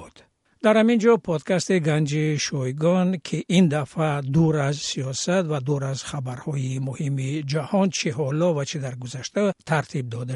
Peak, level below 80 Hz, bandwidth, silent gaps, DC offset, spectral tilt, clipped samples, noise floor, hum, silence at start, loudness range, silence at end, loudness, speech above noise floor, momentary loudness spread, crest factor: -4 dBFS; -58 dBFS; 11.5 kHz; none; under 0.1%; -6 dB/octave; under 0.1%; -57 dBFS; none; 0 s; 4 LU; 0 s; -23 LUFS; 34 dB; 10 LU; 18 dB